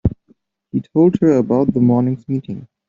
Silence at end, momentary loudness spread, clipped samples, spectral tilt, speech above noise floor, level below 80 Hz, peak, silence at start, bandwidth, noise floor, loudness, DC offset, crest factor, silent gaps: 0.25 s; 12 LU; under 0.1%; -11 dB/octave; 42 dB; -40 dBFS; -2 dBFS; 0.05 s; 7.2 kHz; -57 dBFS; -16 LUFS; under 0.1%; 14 dB; none